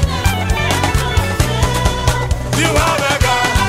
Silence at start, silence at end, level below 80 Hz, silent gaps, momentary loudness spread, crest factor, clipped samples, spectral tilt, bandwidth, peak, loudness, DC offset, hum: 0 s; 0 s; -20 dBFS; none; 3 LU; 12 dB; under 0.1%; -4 dB/octave; 16.5 kHz; -2 dBFS; -15 LUFS; under 0.1%; none